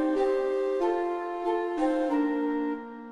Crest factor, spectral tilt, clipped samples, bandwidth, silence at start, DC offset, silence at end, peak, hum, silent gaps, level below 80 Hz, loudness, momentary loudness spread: 14 dB; -5 dB/octave; under 0.1%; 10 kHz; 0 s; under 0.1%; 0 s; -14 dBFS; none; none; -64 dBFS; -28 LUFS; 5 LU